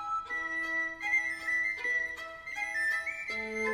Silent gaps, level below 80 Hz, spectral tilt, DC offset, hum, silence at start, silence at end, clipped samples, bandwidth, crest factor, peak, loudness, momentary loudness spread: none; -64 dBFS; -2 dB/octave; under 0.1%; none; 0 s; 0 s; under 0.1%; 15.5 kHz; 14 dB; -20 dBFS; -31 LUFS; 7 LU